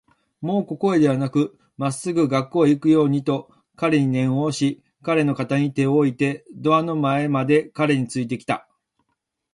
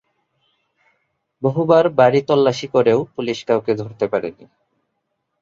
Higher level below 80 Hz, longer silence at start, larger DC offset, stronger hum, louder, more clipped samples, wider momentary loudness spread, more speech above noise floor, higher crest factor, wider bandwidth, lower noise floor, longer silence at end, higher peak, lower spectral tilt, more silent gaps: about the same, -62 dBFS vs -62 dBFS; second, 0.4 s vs 1.4 s; neither; neither; second, -21 LUFS vs -17 LUFS; neither; about the same, 8 LU vs 10 LU; about the same, 56 dB vs 57 dB; about the same, 16 dB vs 18 dB; first, 11.5 kHz vs 7.6 kHz; about the same, -76 dBFS vs -73 dBFS; second, 0.95 s vs 1.1 s; about the same, -4 dBFS vs -2 dBFS; about the same, -7 dB/octave vs -6.5 dB/octave; neither